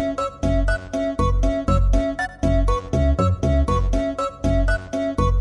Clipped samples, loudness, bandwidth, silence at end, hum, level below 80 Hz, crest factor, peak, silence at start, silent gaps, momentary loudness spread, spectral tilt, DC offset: under 0.1%; -22 LUFS; 11 kHz; 0 s; none; -22 dBFS; 14 dB; -6 dBFS; 0 s; none; 5 LU; -7 dB/octave; under 0.1%